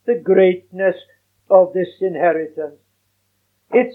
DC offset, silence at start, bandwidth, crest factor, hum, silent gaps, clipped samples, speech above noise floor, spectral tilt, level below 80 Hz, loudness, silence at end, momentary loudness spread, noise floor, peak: under 0.1%; 0.05 s; 4.1 kHz; 18 dB; none; none; under 0.1%; 50 dB; -9 dB/octave; -80 dBFS; -17 LUFS; 0 s; 15 LU; -67 dBFS; 0 dBFS